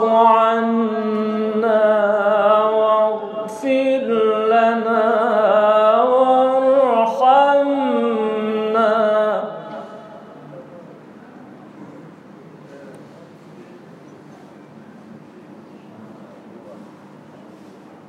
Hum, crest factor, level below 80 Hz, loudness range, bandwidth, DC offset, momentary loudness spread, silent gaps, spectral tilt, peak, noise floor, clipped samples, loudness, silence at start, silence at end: none; 16 dB; -80 dBFS; 8 LU; 9.4 kHz; under 0.1%; 15 LU; none; -6.5 dB/octave; -2 dBFS; -42 dBFS; under 0.1%; -16 LUFS; 0 s; 1 s